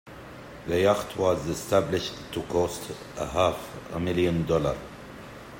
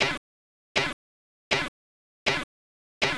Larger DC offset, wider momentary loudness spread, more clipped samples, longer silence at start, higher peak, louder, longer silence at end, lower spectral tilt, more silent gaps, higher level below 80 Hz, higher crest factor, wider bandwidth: neither; first, 18 LU vs 9 LU; neither; about the same, 0.05 s vs 0 s; first, -8 dBFS vs -12 dBFS; about the same, -27 LUFS vs -29 LUFS; about the same, 0 s vs 0 s; first, -5.5 dB/octave vs -2.5 dB/octave; second, none vs 0.18-0.75 s, 0.93-1.51 s, 1.68-2.26 s, 2.44-3.01 s; first, -50 dBFS vs -56 dBFS; about the same, 18 dB vs 20 dB; first, 16.5 kHz vs 11 kHz